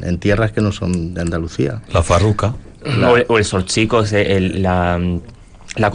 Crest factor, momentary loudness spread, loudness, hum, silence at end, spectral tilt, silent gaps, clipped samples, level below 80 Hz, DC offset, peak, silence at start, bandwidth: 14 dB; 8 LU; -16 LUFS; none; 0 s; -5.5 dB/octave; none; under 0.1%; -34 dBFS; under 0.1%; -2 dBFS; 0 s; 10 kHz